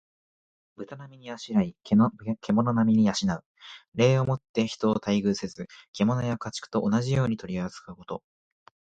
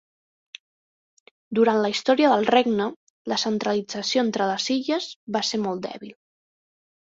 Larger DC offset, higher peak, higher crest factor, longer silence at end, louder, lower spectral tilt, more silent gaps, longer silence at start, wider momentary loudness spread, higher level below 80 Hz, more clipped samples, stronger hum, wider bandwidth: neither; second, -8 dBFS vs -4 dBFS; about the same, 18 dB vs 20 dB; second, 0.7 s vs 0.95 s; second, -26 LUFS vs -23 LUFS; first, -6.5 dB/octave vs -4 dB/octave; second, 3.46-3.55 s, 3.88-3.92 s, 4.49-4.54 s, 5.88-5.94 s vs 2.96-3.25 s, 5.16-5.27 s; second, 0.8 s vs 1.5 s; first, 19 LU vs 12 LU; first, -58 dBFS vs -70 dBFS; neither; neither; first, 8.8 kHz vs 7.8 kHz